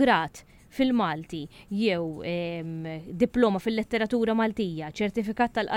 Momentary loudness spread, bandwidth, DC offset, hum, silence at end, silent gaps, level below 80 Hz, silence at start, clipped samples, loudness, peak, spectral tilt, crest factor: 12 LU; 15.5 kHz; under 0.1%; none; 0 s; none; -54 dBFS; 0 s; under 0.1%; -27 LUFS; -8 dBFS; -6.5 dB/octave; 18 dB